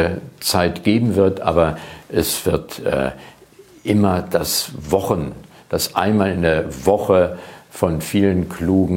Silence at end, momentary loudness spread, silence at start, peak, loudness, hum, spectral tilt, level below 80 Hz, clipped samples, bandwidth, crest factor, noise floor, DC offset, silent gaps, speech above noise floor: 0 s; 7 LU; 0 s; 0 dBFS; -19 LUFS; none; -5 dB/octave; -40 dBFS; under 0.1%; 17.5 kHz; 18 dB; -46 dBFS; under 0.1%; none; 28 dB